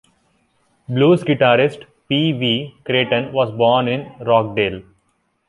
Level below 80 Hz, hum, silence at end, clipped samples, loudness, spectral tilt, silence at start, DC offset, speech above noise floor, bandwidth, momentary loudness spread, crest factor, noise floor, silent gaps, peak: -54 dBFS; none; 0.7 s; under 0.1%; -17 LUFS; -7.5 dB/octave; 0.9 s; under 0.1%; 49 dB; 11 kHz; 8 LU; 16 dB; -66 dBFS; none; -2 dBFS